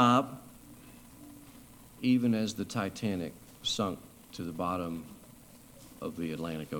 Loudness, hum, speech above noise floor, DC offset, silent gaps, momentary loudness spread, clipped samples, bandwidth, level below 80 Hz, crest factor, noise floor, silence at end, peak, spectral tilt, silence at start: -33 LUFS; none; 23 dB; under 0.1%; none; 24 LU; under 0.1%; 19 kHz; -62 dBFS; 22 dB; -54 dBFS; 0 s; -12 dBFS; -5 dB/octave; 0 s